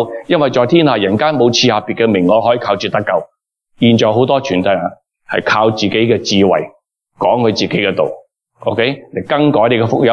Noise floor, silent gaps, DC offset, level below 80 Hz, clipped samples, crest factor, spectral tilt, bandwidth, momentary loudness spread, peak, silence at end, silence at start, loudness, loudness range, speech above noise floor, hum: -52 dBFS; none; under 0.1%; -56 dBFS; under 0.1%; 12 dB; -5.5 dB/octave; 7.2 kHz; 8 LU; 0 dBFS; 0 s; 0 s; -13 LUFS; 3 LU; 40 dB; none